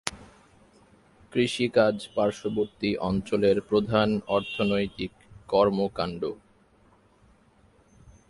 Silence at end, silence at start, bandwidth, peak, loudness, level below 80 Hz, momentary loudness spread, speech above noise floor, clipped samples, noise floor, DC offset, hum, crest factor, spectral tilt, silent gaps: 1.95 s; 0.05 s; 11.5 kHz; 0 dBFS; -26 LUFS; -54 dBFS; 11 LU; 35 dB; under 0.1%; -60 dBFS; under 0.1%; none; 26 dB; -6 dB/octave; none